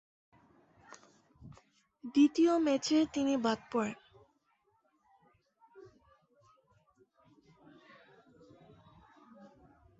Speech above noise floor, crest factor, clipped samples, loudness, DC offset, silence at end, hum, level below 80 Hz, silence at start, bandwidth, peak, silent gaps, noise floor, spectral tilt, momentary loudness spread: 46 dB; 20 dB; under 0.1%; -30 LUFS; under 0.1%; 0.55 s; none; -72 dBFS; 1.45 s; 8 kHz; -16 dBFS; none; -75 dBFS; -4.5 dB/octave; 25 LU